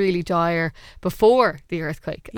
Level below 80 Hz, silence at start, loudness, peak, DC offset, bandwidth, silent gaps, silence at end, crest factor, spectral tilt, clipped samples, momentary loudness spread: -46 dBFS; 0 s; -21 LUFS; -4 dBFS; under 0.1%; 19.5 kHz; none; 0 s; 16 dB; -6.5 dB/octave; under 0.1%; 13 LU